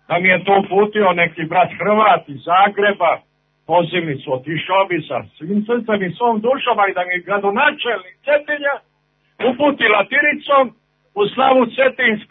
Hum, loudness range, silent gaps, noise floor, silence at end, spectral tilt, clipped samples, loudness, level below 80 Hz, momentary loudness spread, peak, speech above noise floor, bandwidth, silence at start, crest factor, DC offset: none; 3 LU; none; -63 dBFS; 0.05 s; -9 dB/octave; under 0.1%; -16 LUFS; -64 dBFS; 9 LU; 0 dBFS; 47 dB; 4.1 kHz; 0.1 s; 16 dB; under 0.1%